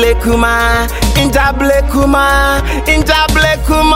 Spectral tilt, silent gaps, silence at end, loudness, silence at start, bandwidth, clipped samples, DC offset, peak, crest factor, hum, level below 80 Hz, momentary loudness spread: -4.5 dB/octave; none; 0 s; -10 LUFS; 0 s; 16.5 kHz; under 0.1%; under 0.1%; 0 dBFS; 10 dB; none; -16 dBFS; 3 LU